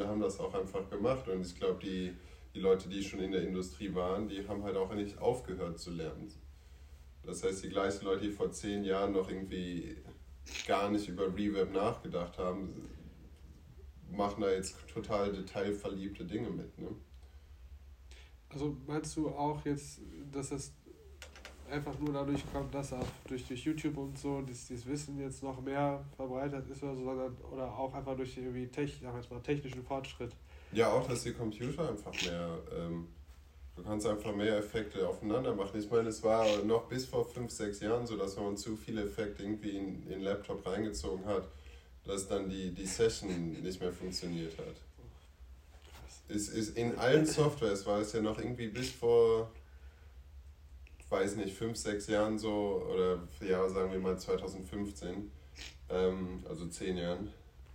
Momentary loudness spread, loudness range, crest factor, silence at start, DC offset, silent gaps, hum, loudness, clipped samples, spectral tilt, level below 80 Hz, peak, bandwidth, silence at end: 19 LU; 7 LU; 24 dB; 0 s; under 0.1%; none; none; -37 LUFS; under 0.1%; -5.5 dB/octave; -56 dBFS; -14 dBFS; 16 kHz; 0 s